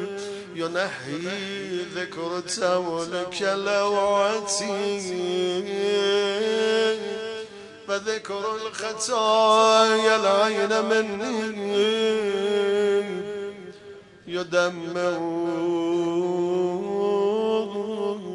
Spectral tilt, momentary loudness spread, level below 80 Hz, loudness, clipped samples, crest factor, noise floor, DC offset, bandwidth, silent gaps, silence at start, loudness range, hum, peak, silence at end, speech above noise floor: -3.5 dB/octave; 12 LU; -70 dBFS; -24 LUFS; under 0.1%; 18 dB; -45 dBFS; under 0.1%; 11 kHz; none; 0 s; 6 LU; none; -6 dBFS; 0 s; 22 dB